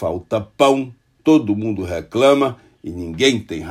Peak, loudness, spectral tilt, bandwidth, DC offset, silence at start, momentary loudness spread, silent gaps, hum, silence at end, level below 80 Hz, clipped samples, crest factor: 0 dBFS; -18 LUFS; -5 dB/octave; 13.5 kHz; under 0.1%; 0 s; 15 LU; none; none; 0 s; -52 dBFS; under 0.1%; 18 dB